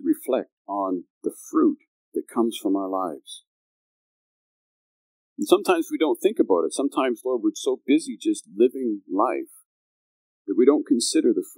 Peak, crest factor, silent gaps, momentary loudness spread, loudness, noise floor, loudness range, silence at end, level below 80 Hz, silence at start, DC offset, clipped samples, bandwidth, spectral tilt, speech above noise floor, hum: -2 dBFS; 24 dB; 0.52-0.65 s, 1.10-1.21 s, 1.88-2.12 s, 3.47-5.36 s, 9.65-10.45 s; 13 LU; -24 LUFS; under -90 dBFS; 6 LU; 0.05 s; under -90 dBFS; 0 s; under 0.1%; under 0.1%; 16 kHz; -3.5 dB/octave; over 67 dB; none